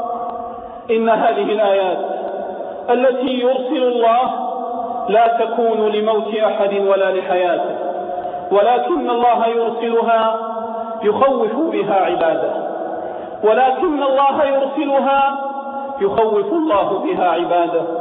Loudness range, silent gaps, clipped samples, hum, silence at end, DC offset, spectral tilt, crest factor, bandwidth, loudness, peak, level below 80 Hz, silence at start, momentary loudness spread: 1 LU; none; under 0.1%; none; 0 s; under 0.1%; -8.5 dB/octave; 14 dB; 4 kHz; -17 LUFS; -2 dBFS; -58 dBFS; 0 s; 10 LU